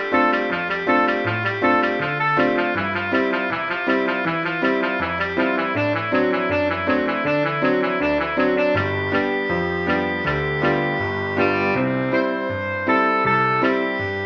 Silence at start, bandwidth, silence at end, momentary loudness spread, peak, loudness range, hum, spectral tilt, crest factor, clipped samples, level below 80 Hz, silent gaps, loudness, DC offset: 0 s; 6.8 kHz; 0 s; 4 LU; -4 dBFS; 1 LU; none; -7.5 dB/octave; 16 dB; under 0.1%; -50 dBFS; none; -20 LUFS; under 0.1%